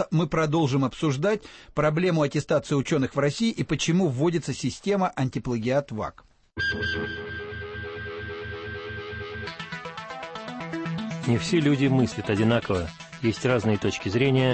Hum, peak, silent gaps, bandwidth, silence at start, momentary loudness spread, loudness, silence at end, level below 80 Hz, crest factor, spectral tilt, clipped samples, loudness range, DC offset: none; -10 dBFS; none; 8.8 kHz; 0 s; 12 LU; -26 LUFS; 0 s; -50 dBFS; 14 dB; -6 dB/octave; under 0.1%; 10 LU; under 0.1%